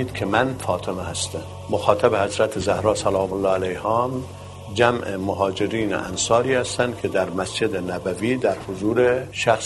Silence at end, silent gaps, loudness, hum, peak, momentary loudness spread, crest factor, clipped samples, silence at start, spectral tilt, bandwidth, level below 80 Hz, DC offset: 0 s; none; -22 LUFS; none; 0 dBFS; 8 LU; 22 dB; under 0.1%; 0 s; -4.5 dB/octave; 12 kHz; -48 dBFS; under 0.1%